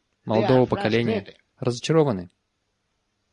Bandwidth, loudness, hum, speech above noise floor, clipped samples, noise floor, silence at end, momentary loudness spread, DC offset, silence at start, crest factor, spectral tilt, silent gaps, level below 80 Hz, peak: 10.5 kHz; -23 LUFS; none; 53 dB; under 0.1%; -74 dBFS; 1.05 s; 10 LU; under 0.1%; 0.25 s; 18 dB; -6.5 dB/octave; none; -54 dBFS; -6 dBFS